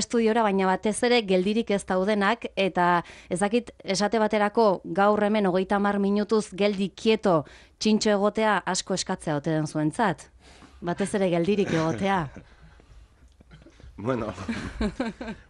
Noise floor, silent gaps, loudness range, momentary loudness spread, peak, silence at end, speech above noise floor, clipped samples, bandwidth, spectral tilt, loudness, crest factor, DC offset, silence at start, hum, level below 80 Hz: -54 dBFS; none; 5 LU; 8 LU; -10 dBFS; 0.15 s; 29 dB; under 0.1%; 11 kHz; -5 dB/octave; -25 LUFS; 16 dB; under 0.1%; 0 s; none; -50 dBFS